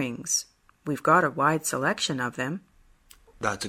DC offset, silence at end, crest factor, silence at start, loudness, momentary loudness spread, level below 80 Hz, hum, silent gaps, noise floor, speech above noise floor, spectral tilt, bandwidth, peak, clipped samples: under 0.1%; 0 s; 20 dB; 0 s; -26 LUFS; 14 LU; -62 dBFS; none; none; -56 dBFS; 30 dB; -3 dB/octave; 16 kHz; -8 dBFS; under 0.1%